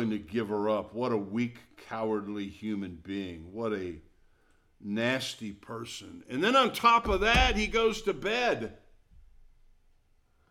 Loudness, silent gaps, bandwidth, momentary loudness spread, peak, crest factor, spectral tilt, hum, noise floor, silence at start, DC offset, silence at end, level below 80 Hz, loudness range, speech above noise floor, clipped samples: -29 LUFS; none; 16.5 kHz; 17 LU; -8 dBFS; 22 dB; -4.5 dB/octave; none; -66 dBFS; 0 s; under 0.1%; 1.25 s; -44 dBFS; 10 LU; 37 dB; under 0.1%